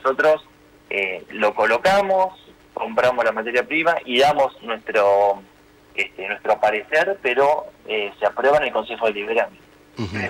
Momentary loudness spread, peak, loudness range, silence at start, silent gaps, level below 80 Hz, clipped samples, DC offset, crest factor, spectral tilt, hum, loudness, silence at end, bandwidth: 9 LU; -8 dBFS; 2 LU; 0.05 s; none; -56 dBFS; under 0.1%; under 0.1%; 14 dB; -4 dB/octave; 50 Hz at -60 dBFS; -20 LUFS; 0 s; 16.5 kHz